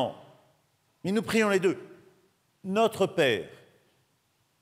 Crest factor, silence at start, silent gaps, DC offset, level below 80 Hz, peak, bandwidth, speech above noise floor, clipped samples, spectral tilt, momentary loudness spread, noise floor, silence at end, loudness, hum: 18 dB; 0 s; none; under 0.1%; -70 dBFS; -12 dBFS; 16 kHz; 45 dB; under 0.1%; -5 dB/octave; 14 LU; -71 dBFS; 1.1 s; -27 LUFS; none